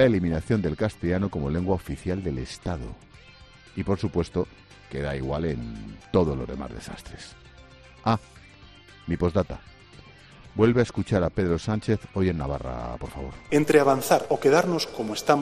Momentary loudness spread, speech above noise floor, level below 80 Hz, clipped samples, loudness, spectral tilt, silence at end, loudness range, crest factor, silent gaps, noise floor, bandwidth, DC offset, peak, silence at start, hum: 17 LU; 25 dB; -44 dBFS; under 0.1%; -26 LUFS; -6.5 dB/octave; 0 s; 8 LU; 20 dB; none; -50 dBFS; 14 kHz; under 0.1%; -6 dBFS; 0 s; none